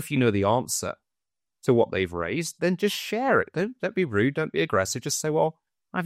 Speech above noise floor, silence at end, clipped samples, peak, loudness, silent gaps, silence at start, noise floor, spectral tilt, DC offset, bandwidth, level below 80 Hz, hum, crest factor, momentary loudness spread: over 65 dB; 0 s; under 0.1%; -8 dBFS; -25 LUFS; none; 0 s; under -90 dBFS; -4.5 dB/octave; under 0.1%; 16 kHz; -60 dBFS; none; 18 dB; 6 LU